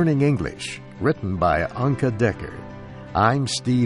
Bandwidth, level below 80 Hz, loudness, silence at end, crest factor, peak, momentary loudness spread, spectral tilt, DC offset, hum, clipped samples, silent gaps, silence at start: 11.5 kHz; -44 dBFS; -22 LUFS; 0 s; 18 dB; -4 dBFS; 15 LU; -6 dB/octave; under 0.1%; none; under 0.1%; none; 0 s